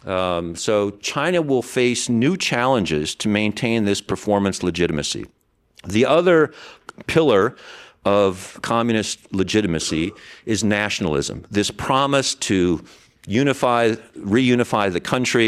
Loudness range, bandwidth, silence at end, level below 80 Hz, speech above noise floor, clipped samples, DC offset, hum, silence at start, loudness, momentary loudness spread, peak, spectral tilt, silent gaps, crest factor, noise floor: 2 LU; 14 kHz; 0 s; -48 dBFS; 32 dB; under 0.1%; under 0.1%; none; 0.05 s; -20 LUFS; 8 LU; -4 dBFS; -4.5 dB/octave; none; 16 dB; -52 dBFS